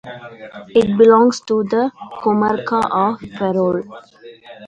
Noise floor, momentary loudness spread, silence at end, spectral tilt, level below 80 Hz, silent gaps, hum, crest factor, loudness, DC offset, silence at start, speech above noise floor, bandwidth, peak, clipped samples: -39 dBFS; 23 LU; 0 s; -6.5 dB/octave; -54 dBFS; none; none; 16 dB; -16 LUFS; under 0.1%; 0.05 s; 23 dB; 9 kHz; 0 dBFS; under 0.1%